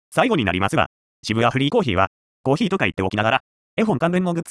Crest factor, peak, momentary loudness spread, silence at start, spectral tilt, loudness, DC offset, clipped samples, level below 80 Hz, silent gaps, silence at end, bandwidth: 18 dB; -2 dBFS; 6 LU; 0.1 s; -6 dB/octave; -21 LUFS; under 0.1%; under 0.1%; -50 dBFS; 0.86-1.23 s, 2.07-2.44 s, 3.40-3.77 s; 0 s; 11 kHz